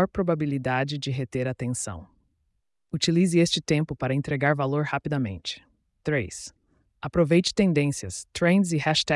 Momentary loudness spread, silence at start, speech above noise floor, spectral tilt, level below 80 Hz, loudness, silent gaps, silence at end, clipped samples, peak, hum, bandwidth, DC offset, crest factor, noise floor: 14 LU; 0 s; 49 dB; -5 dB/octave; -54 dBFS; -25 LUFS; none; 0 s; under 0.1%; -10 dBFS; none; 12 kHz; under 0.1%; 16 dB; -74 dBFS